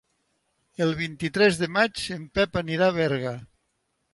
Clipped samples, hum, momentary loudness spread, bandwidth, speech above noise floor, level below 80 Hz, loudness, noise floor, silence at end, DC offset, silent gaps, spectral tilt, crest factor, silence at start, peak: under 0.1%; none; 11 LU; 11.5 kHz; 50 dB; -52 dBFS; -25 LUFS; -75 dBFS; 0.7 s; under 0.1%; none; -5 dB/octave; 18 dB; 0.8 s; -8 dBFS